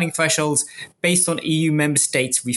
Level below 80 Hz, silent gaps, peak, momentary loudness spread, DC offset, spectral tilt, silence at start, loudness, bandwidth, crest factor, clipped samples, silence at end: -62 dBFS; none; -4 dBFS; 4 LU; under 0.1%; -3.5 dB/octave; 0 s; -18 LUFS; 12 kHz; 16 dB; under 0.1%; 0 s